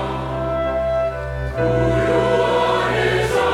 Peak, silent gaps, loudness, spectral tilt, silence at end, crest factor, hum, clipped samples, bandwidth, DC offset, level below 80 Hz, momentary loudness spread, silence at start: -6 dBFS; none; -19 LUFS; -6 dB/octave; 0 s; 14 dB; none; under 0.1%; 15 kHz; under 0.1%; -32 dBFS; 7 LU; 0 s